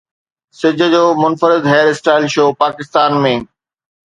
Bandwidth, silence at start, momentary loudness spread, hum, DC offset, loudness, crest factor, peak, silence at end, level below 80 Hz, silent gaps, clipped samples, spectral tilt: 10.5 kHz; 0.6 s; 6 LU; none; under 0.1%; -13 LUFS; 14 dB; 0 dBFS; 0.6 s; -58 dBFS; none; under 0.1%; -5.5 dB/octave